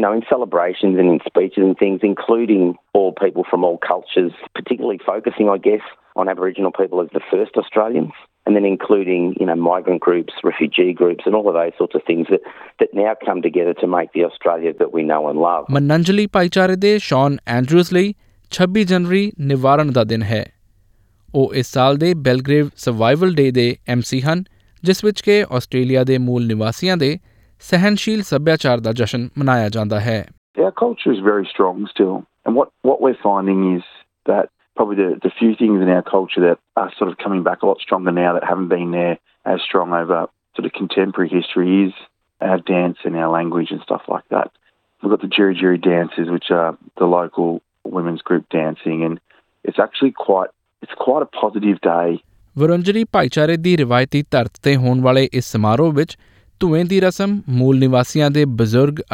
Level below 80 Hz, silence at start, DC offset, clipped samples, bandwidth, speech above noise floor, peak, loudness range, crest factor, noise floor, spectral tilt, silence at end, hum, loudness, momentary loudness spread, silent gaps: -54 dBFS; 0 s; under 0.1%; under 0.1%; 16.5 kHz; 38 dB; 0 dBFS; 3 LU; 16 dB; -55 dBFS; -7 dB/octave; 0.1 s; none; -17 LUFS; 7 LU; 30.38-30.54 s